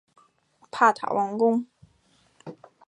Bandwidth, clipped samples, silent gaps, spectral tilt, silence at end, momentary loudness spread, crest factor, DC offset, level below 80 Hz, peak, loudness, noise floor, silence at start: 10.5 kHz; under 0.1%; none; -5.5 dB/octave; 0.35 s; 24 LU; 22 dB; under 0.1%; -74 dBFS; -6 dBFS; -23 LUFS; -64 dBFS; 0.75 s